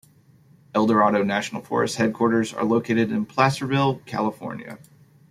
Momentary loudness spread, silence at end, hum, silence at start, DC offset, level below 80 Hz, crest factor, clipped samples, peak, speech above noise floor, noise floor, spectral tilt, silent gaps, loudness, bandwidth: 9 LU; 0.55 s; none; 0.75 s; under 0.1%; -62 dBFS; 20 dB; under 0.1%; -2 dBFS; 33 dB; -55 dBFS; -6 dB/octave; none; -22 LUFS; 14 kHz